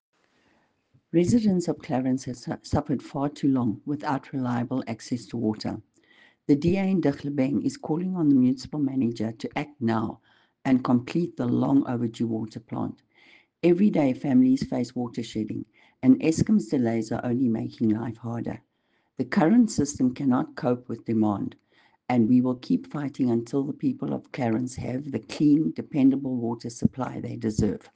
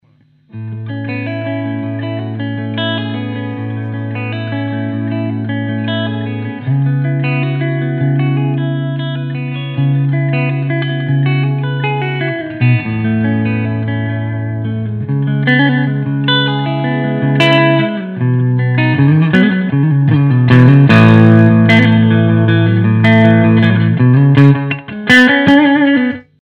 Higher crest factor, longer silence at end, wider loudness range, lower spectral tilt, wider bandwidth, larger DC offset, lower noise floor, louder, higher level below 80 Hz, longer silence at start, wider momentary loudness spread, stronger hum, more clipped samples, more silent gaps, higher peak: first, 20 dB vs 12 dB; about the same, 0.15 s vs 0.2 s; second, 3 LU vs 11 LU; about the same, -7 dB/octave vs -8 dB/octave; first, 9.4 kHz vs 7.2 kHz; neither; first, -71 dBFS vs -51 dBFS; second, -26 LUFS vs -12 LUFS; second, -54 dBFS vs -48 dBFS; first, 1.15 s vs 0.55 s; about the same, 12 LU vs 13 LU; neither; second, under 0.1% vs 0.5%; neither; second, -6 dBFS vs 0 dBFS